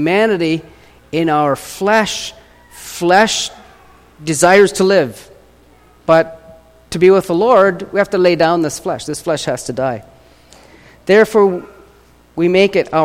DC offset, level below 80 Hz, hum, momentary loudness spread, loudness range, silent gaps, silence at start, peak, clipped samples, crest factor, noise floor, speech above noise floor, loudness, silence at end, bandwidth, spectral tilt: under 0.1%; -48 dBFS; none; 14 LU; 3 LU; none; 0 s; 0 dBFS; under 0.1%; 14 dB; -47 dBFS; 34 dB; -14 LUFS; 0 s; 16 kHz; -4.5 dB/octave